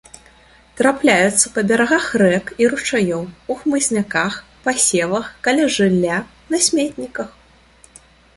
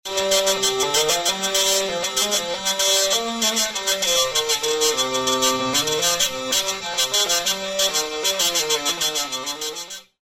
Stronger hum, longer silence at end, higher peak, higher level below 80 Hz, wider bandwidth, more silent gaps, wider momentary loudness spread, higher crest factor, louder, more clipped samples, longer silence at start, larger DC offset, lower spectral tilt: neither; first, 1.05 s vs 0.2 s; first, 0 dBFS vs -4 dBFS; about the same, -52 dBFS vs -54 dBFS; second, 11.5 kHz vs 16.5 kHz; neither; first, 10 LU vs 5 LU; about the same, 18 dB vs 18 dB; about the same, -17 LUFS vs -19 LUFS; neither; first, 0.75 s vs 0.05 s; neither; first, -3.5 dB/octave vs 0 dB/octave